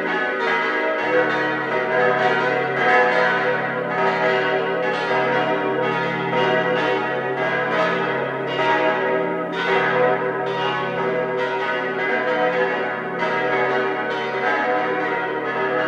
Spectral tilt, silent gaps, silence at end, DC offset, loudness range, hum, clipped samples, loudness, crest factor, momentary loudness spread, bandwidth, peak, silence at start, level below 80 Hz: -5.5 dB/octave; none; 0 s; under 0.1%; 3 LU; none; under 0.1%; -20 LUFS; 16 dB; 5 LU; 8.6 kHz; -4 dBFS; 0 s; -66 dBFS